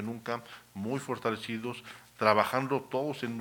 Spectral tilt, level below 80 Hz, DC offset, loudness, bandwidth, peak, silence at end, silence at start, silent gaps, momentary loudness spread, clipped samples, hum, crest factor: -5.5 dB/octave; -74 dBFS; under 0.1%; -32 LUFS; 19 kHz; -8 dBFS; 0 s; 0 s; none; 14 LU; under 0.1%; none; 24 dB